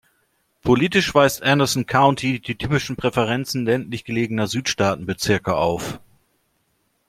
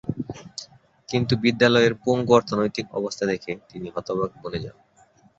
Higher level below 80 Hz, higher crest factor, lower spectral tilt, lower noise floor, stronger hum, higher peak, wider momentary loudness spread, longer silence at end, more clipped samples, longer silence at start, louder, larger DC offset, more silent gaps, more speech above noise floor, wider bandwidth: first, -48 dBFS vs -54 dBFS; about the same, 20 dB vs 20 dB; about the same, -5 dB/octave vs -5.5 dB/octave; first, -68 dBFS vs -57 dBFS; neither; about the same, -2 dBFS vs -4 dBFS; second, 8 LU vs 16 LU; first, 1.1 s vs 0.65 s; neither; first, 0.65 s vs 0.05 s; first, -20 LUFS vs -23 LUFS; neither; neither; first, 48 dB vs 35 dB; first, 16 kHz vs 8 kHz